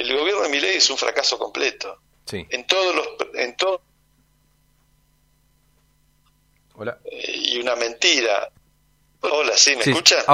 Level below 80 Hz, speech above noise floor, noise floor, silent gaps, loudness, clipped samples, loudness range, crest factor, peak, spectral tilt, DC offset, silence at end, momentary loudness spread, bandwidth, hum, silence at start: -62 dBFS; 41 dB; -61 dBFS; none; -19 LUFS; under 0.1%; 13 LU; 22 dB; 0 dBFS; -1 dB/octave; under 0.1%; 0 s; 19 LU; 16 kHz; 50 Hz at -65 dBFS; 0 s